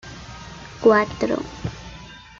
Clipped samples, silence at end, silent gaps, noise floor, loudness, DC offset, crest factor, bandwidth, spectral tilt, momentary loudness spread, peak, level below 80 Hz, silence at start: under 0.1%; 0.2 s; none; -41 dBFS; -21 LUFS; under 0.1%; 20 dB; 7.6 kHz; -6 dB/octave; 21 LU; -4 dBFS; -46 dBFS; 0.05 s